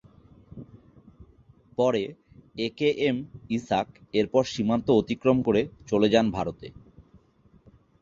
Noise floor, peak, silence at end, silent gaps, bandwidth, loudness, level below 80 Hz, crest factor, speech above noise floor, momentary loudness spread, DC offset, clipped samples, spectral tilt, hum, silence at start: -59 dBFS; -6 dBFS; 1 s; none; 7.6 kHz; -26 LUFS; -56 dBFS; 20 dB; 34 dB; 19 LU; under 0.1%; under 0.1%; -6.5 dB/octave; none; 0.55 s